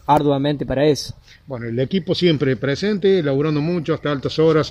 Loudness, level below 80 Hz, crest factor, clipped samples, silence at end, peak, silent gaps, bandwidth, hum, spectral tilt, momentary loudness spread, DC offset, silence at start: -19 LUFS; -46 dBFS; 16 dB; under 0.1%; 0 s; -2 dBFS; none; 14 kHz; none; -6.5 dB/octave; 7 LU; under 0.1%; 0.1 s